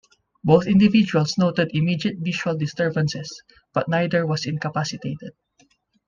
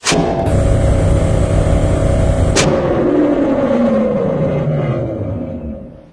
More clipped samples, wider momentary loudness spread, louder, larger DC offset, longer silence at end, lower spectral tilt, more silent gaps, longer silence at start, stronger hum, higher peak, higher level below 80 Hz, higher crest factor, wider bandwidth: neither; first, 15 LU vs 9 LU; second, -21 LUFS vs -15 LUFS; neither; first, 0.8 s vs 0.15 s; about the same, -6.5 dB/octave vs -6 dB/octave; neither; first, 0.45 s vs 0 s; neither; about the same, -2 dBFS vs 0 dBFS; second, -56 dBFS vs -22 dBFS; first, 20 dB vs 14 dB; second, 7.4 kHz vs 11 kHz